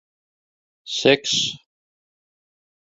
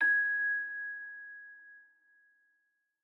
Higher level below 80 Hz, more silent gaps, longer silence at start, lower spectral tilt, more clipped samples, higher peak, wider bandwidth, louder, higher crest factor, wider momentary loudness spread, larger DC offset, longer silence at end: first, -64 dBFS vs under -90 dBFS; neither; first, 0.85 s vs 0 s; about the same, -2.5 dB/octave vs -2.5 dB/octave; neither; first, 0 dBFS vs -20 dBFS; first, 7.8 kHz vs 4.2 kHz; first, -20 LUFS vs -32 LUFS; first, 24 dB vs 16 dB; second, 12 LU vs 23 LU; neither; about the same, 1.3 s vs 1.25 s